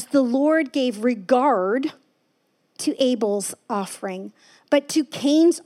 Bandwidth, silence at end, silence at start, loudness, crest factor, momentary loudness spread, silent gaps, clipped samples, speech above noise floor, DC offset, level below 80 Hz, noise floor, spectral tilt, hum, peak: 14.5 kHz; 0.05 s; 0 s; -22 LUFS; 16 dB; 12 LU; none; under 0.1%; 47 dB; under 0.1%; -84 dBFS; -68 dBFS; -4 dB/octave; none; -6 dBFS